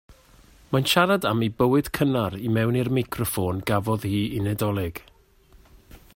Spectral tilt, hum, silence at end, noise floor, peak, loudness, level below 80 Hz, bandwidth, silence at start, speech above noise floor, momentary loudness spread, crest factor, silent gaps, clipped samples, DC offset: -5.5 dB/octave; none; 0.2 s; -55 dBFS; -6 dBFS; -24 LUFS; -50 dBFS; 16.5 kHz; 0.1 s; 32 dB; 7 LU; 20 dB; none; under 0.1%; under 0.1%